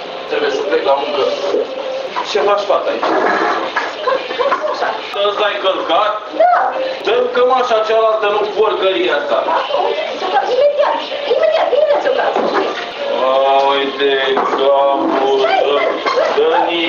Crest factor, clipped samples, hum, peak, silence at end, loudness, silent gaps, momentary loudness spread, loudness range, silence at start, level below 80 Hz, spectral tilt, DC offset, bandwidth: 14 dB; under 0.1%; none; 0 dBFS; 0 s; -15 LUFS; none; 6 LU; 3 LU; 0 s; -62 dBFS; -3 dB/octave; under 0.1%; 7.4 kHz